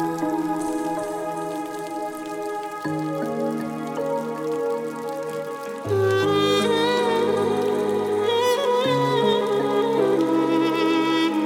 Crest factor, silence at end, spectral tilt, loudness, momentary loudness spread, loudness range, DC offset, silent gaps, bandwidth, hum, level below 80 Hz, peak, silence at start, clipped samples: 14 dB; 0 s; -5 dB/octave; -23 LUFS; 10 LU; 7 LU; under 0.1%; none; 16.5 kHz; none; -66 dBFS; -8 dBFS; 0 s; under 0.1%